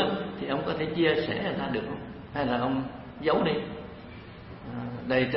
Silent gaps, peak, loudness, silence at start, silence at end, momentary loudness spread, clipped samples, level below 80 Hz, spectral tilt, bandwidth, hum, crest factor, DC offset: none; -10 dBFS; -29 LUFS; 0 s; 0 s; 18 LU; under 0.1%; -54 dBFS; -10 dB/octave; 5.8 kHz; none; 18 dB; under 0.1%